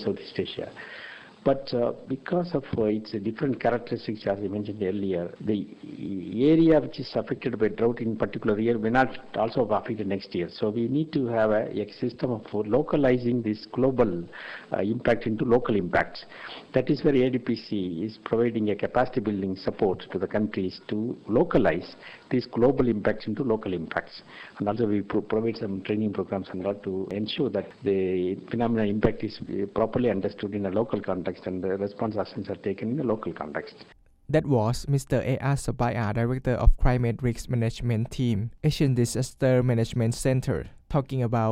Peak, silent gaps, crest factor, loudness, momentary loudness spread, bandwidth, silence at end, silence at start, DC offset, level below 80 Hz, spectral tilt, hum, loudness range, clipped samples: -4 dBFS; none; 22 dB; -27 LUFS; 9 LU; 15 kHz; 0 s; 0 s; under 0.1%; -40 dBFS; -7 dB/octave; none; 3 LU; under 0.1%